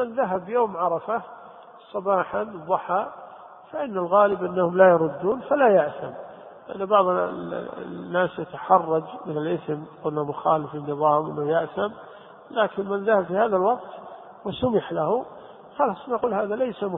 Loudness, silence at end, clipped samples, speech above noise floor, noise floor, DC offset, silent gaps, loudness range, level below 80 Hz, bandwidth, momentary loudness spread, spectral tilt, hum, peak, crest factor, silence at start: -24 LUFS; 0 s; under 0.1%; 23 dB; -46 dBFS; under 0.1%; none; 5 LU; -62 dBFS; 3.9 kHz; 17 LU; -11 dB/octave; none; -2 dBFS; 22 dB; 0 s